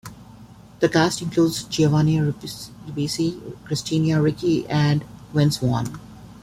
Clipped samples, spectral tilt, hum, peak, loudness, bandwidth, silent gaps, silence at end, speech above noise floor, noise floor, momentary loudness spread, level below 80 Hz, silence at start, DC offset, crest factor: under 0.1%; -6 dB/octave; none; -4 dBFS; -22 LUFS; 15 kHz; none; 0.1 s; 24 dB; -45 dBFS; 14 LU; -50 dBFS; 0.05 s; under 0.1%; 18 dB